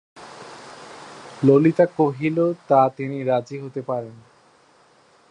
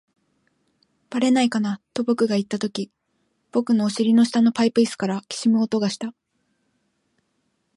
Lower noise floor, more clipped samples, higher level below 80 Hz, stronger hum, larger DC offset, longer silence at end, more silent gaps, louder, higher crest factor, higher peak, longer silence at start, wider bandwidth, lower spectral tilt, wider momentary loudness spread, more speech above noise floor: second, -56 dBFS vs -71 dBFS; neither; about the same, -68 dBFS vs -72 dBFS; neither; neither; second, 1.15 s vs 1.65 s; neither; about the same, -20 LUFS vs -22 LUFS; about the same, 20 dB vs 16 dB; first, -2 dBFS vs -6 dBFS; second, 0.15 s vs 1.1 s; second, 10 kHz vs 11.5 kHz; first, -8.5 dB/octave vs -5.5 dB/octave; first, 24 LU vs 10 LU; second, 36 dB vs 51 dB